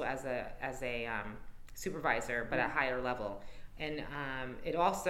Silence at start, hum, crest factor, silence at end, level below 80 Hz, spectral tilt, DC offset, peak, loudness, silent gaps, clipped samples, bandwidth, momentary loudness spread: 0 s; none; 20 dB; 0 s; -52 dBFS; -4.5 dB/octave; under 0.1%; -16 dBFS; -37 LUFS; none; under 0.1%; 16.5 kHz; 12 LU